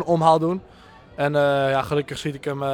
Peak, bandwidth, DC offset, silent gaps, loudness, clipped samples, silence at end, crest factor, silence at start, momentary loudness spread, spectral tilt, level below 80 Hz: -4 dBFS; 17 kHz; under 0.1%; none; -22 LUFS; under 0.1%; 0 s; 18 dB; 0 s; 11 LU; -6.5 dB/octave; -52 dBFS